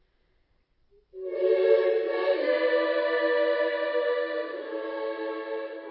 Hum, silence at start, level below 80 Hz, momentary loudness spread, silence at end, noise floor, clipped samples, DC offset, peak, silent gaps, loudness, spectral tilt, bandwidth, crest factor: none; 1.15 s; -74 dBFS; 12 LU; 0 s; -68 dBFS; under 0.1%; under 0.1%; -10 dBFS; none; -27 LUFS; -6 dB/octave; 5.6 kHz; 18 dB